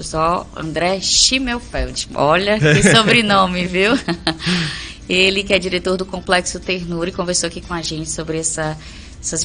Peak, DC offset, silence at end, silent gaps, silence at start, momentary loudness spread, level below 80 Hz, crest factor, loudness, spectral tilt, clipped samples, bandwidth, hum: 0 dBFS; under 0.1%; 0 s; none; 0 s; 12 LU; -36 dBFS; 18 dB; -16 LUFS; -3.5 dB/octave; under 0.1%; 10.5 kHz; none